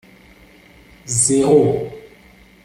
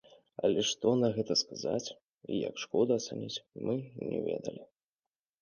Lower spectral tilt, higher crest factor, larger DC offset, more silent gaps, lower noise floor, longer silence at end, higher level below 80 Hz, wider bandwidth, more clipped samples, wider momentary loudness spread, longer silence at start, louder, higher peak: about the same, -5 dB/octave vs -4.5 dB/octave; about the same, 18 dB vs 18 dB; neither; second, none vs 2.03-2.17 s; second, -47 dBFS vs under -90 dBFS; second, 0.6 s vs 0.75 s; first, -50 dBFS vs -72 dBFS; first, 14.5 kHz vs 10 kHz; neither; first, 18 LU vs 13 LU; first, 1.05 s vs 0.4 s; first, -15 LUFS vs -33 LUFS; first, -2 dBFS vs -16 dBFS